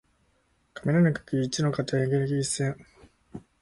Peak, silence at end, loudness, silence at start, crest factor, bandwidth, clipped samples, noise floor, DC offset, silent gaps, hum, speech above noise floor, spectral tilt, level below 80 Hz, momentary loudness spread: -12 dBFS; 0.2 s; -26 LUFS; 0.75 s; 16 dB; 11.5 kHz; under 0.1%; -68 dBFS; under 0.1%; none; none; 43 dB; -6 dB/octave; -58 dBFS; 23 LU